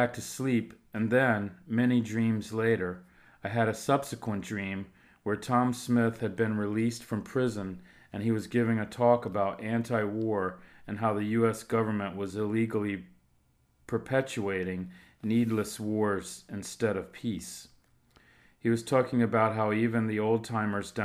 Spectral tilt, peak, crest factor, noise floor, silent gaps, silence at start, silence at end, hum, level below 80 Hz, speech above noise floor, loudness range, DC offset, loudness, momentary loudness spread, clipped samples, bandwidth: -6.5 dB/octave; -10 dBFS; 20 dB; -68 dBFS; none; 0 s; 0 s; none; -66 dBFS; 39 dB; 3 LU; under 0.1%; -30 LUFS; 12 LU; under 0.1%; 15.5 kHz